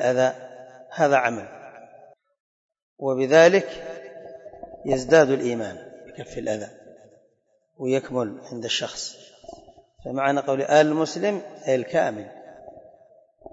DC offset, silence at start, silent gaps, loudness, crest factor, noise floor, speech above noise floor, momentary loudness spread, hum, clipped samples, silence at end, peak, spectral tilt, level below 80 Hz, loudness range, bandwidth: under 0.1%; 0 s; 2.40-2.69 s, 2.82-2.96 s; -22 LUFS; 20 dB; -68 dBFS; 46 dB; 25 LU; none; under 0.1%; 0.75 s; -6 dBFS; -4.5 dB/octave; -60 dBFS; 9 LU; 8 kHz